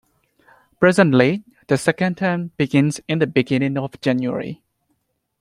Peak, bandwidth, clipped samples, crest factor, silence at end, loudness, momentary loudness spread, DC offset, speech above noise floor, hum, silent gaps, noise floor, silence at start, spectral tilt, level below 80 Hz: 0 dBFS; 12.5 kHz; under 0.1%; 20 dB; 0.85 s; -19 LUFS; 10 LU; under 0.1%; 52 dB; none; none; -70 dBFS; 0.8 s; -6.5 dB/octave; -58 dBFS